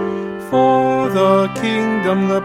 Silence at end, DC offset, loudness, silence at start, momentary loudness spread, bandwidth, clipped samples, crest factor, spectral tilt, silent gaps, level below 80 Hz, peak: 0 s; under 0.1%; -16 LUFS; 0 s; 6 LU; 15.5 kHz; under 0.1%; 14 dB; -6.5 dB/octave; none; -56 dBFS; -2 dBFS